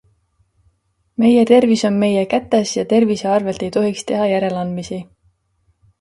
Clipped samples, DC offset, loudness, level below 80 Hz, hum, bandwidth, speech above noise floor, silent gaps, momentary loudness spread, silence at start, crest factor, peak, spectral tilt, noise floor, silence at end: under 0.1%; under 0.1%; -16 LUFS; -54 dBFS; none; 11.5 kHz; 47 dB; none; 12 LU; 1.2 s; 18 dB; 0 dBFS; -5.5 dB/octave; -63 dBFS; 0.95 s